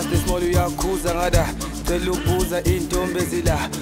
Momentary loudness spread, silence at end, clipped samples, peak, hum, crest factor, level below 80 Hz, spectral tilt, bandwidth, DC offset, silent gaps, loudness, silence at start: 3 LU; 0 s; under 0.1%; -4 dBFS; none; 16 dB; -28 dBFS; -5 dB/octave; 16.5 kHz; under 0.1%; none; -22 LUFS; 0 s